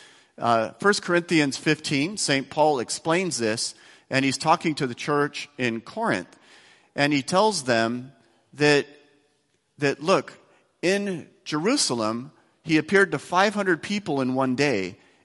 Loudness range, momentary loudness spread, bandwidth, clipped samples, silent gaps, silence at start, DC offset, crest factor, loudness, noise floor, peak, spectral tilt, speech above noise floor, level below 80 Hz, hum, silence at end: 3 LU; 8 LU; 12 kHz; under 0.1%; none; 0.4 s; under 0.1%; 20 dB; -24 LUFS; -69 dBFS; -4 dBFS; -4 dB/octave; 46 dB; -66 dBFS; none; 0.3 s